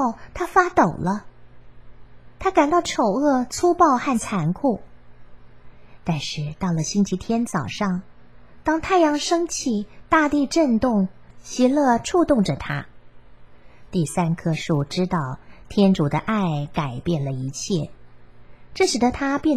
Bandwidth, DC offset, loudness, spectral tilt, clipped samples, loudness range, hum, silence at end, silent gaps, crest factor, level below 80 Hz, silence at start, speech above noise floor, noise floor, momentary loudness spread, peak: 15 kHz; 0.6%; -22 LUFS; -5.5 dB/octave; under 0.1%; 5 LU; none; 0 s; none; 20 dB; -48 dBFS; 0 s; 28 dB; -49 dBFS; 10 LU; -2 dBFS